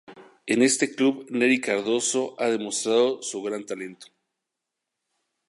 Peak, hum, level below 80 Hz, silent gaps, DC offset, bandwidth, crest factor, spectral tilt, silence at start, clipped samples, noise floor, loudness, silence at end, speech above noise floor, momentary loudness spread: -8 dBFS; none; -80 dBFS; none; under 0.1%; 11.5 kHz; 18 dB; -2.5 dB/octave; 0.1 s; under 0.1%; -84 dBFS; -24 LUFS; 1.45 s; 60 dB; 12 LU